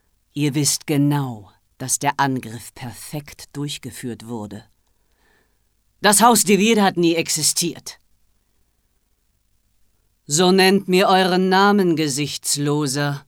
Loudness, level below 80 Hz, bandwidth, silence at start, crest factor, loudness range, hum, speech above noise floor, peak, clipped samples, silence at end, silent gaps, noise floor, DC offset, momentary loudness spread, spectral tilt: -17 LUFS; -60 dBFS; 18.5 kHz; 0.35 s; 18 dB; 10 LU; none; 47 dB; -2 dBFS; under 0.1%; 0.1 s; none; -66 dBFS; under 0.1%; 20 LU; -3.5 dB/octave